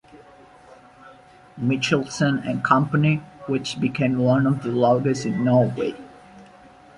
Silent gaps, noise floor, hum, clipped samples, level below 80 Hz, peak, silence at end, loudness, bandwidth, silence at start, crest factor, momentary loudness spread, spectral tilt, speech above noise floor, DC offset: none; -48 dBFS; none; under 0.1%; -58 dBFS; -4 dBFS; 0.55 s; -21 LUFS; 11 kHz; 0.15 s; 20 dB; 8 LU; -6.5 dB/octave; 28 dB; under 0.1%